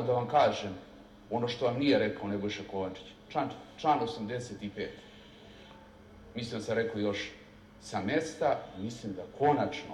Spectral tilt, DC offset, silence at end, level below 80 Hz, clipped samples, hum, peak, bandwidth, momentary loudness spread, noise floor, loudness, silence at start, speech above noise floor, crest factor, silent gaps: -5.5 dB/octave; under 0.1%; 0 s; -64 dBFS; under 0.1%; none; -14 dBFS; 12 kHz; 23 LU; -53 dBFS; -32 LUFS; 0 s; 21 dB; 20 dB; none